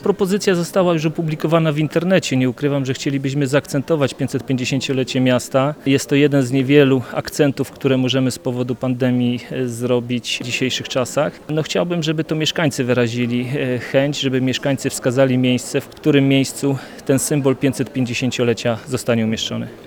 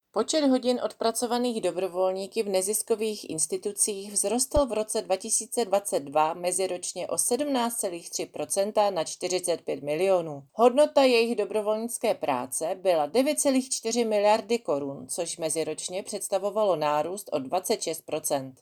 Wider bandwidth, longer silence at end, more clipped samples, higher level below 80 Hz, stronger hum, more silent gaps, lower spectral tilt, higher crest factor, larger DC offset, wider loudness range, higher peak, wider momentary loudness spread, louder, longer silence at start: about the same, 19.5 kHz vs over 20 kHz; about the same, 0 s vs 0.1 s; neither; about the same, -54 dBFS vs -54 dBFS; neither; neither; first, -5.5 dB/octave vs -3 dB/octave; about the same, 18 dB vs 18 dB; neither; about the same, 3 LU vs 3 LU; first, 0 dBFS vs -8 dBFS; about the same, 6 LU vs 7 LU; first, -18 LUFS vs -26 LUFS; second, 0 s vs 0.15 s